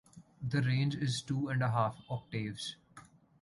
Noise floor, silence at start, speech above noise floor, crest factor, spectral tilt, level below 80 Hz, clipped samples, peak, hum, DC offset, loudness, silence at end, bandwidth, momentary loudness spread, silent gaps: -59 dBFS; 0.15 s; 25 dB; 16 dB; -6 dB/octave; -66 dBFS; under 0.1%; -18 dBFS; none; under 0.1%; -35 LUFS; 0.4 s; 11.5 kHz; 11 LU; none